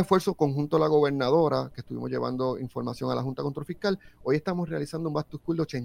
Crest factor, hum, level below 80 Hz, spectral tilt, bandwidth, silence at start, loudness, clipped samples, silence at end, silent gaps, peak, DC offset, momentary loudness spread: 20 dB; none; -56 dBFS; -7 dB/octave; 16 kHz; 0 s; -28 LUFS; under 0.1%; 0 s; none; -8 dBFS; under 0.1%; 10 LU